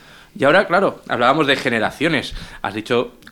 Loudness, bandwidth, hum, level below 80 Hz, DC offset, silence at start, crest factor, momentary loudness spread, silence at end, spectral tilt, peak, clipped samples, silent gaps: -18 LUFS; 18.5 kHz; none; -44 dBFS; under 0.1%; 0.35 s; 18 dB; 12 LU; 0.2 s; -5 dB/octave; -2 dBFS; under 0.1%; none